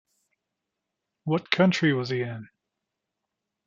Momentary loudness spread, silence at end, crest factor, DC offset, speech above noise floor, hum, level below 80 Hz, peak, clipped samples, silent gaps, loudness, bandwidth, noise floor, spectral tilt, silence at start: 15 LU; 1.2 s; 26 dB; under 0.1%; 60 dB; none; -72 dBFS; -2 dBFS; under 0.1%; none; -25 LUFS; 7.6 kHz; -84 dBFS; -6 dB/octave; 1.25 s